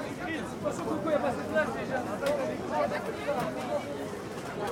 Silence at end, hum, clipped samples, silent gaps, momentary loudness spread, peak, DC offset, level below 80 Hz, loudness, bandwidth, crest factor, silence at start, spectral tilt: 0 s; none; under 0.1%; none; 7 LU; -16 dBFS; under 0.1%; -58 dBFS; -32 LUFS; 17.5 kHz; 16 dB; 0 s; -5.5 dB/octave